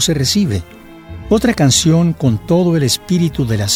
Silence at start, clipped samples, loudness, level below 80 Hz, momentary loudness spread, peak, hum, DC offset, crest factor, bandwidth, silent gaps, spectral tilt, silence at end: 0 s; under 0.1%; -14 LUFS; -36 dBFS; 8 LU; 0 dBFS; none; under 0.1%; 14 dB; 16.5 kHz; none; -5 dB/octave; 0 s